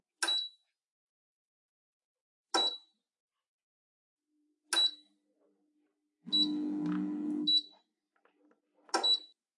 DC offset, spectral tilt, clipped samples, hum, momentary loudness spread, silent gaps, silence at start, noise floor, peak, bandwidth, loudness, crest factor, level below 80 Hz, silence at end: under 0.1%; -2 dB/octave; under 0.1%; none; 8 LU; 0.85-2.15 s, 2.21-2.44 s, 3.20-3.29 s, 3.48-4.17 s; 0.2 s; -79 dBFS; -16 dBFS; 11.5 kHz; -31 LUFS; 22 dB; under -90 dBFS; 0.3 s